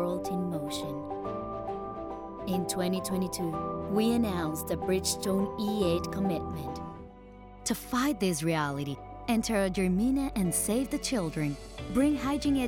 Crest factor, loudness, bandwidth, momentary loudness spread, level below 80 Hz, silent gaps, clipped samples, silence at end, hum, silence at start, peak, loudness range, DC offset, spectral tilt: 16 dB; -31 LUFS; 19 kHz; 11 LU; -48 dBFS; none; under 0.1%; 0 s; none; 0 s; -16 dBFS; 4 LU; under 0.1%; -5 dB/octave